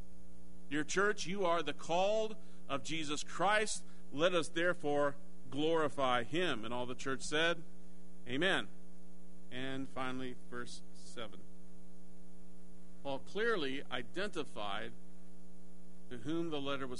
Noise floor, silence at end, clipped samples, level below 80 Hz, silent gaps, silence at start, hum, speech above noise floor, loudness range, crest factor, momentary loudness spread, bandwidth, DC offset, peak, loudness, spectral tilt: -59 dBFS; 0 s; under 0.1%; -66 dBFS; none; 0 s; none; 22 dB; 11 LU; 22 dB; 15 LU; 10.5 kHz; 2%; -18 dBFS; -37 LUFS; -4 dB/octave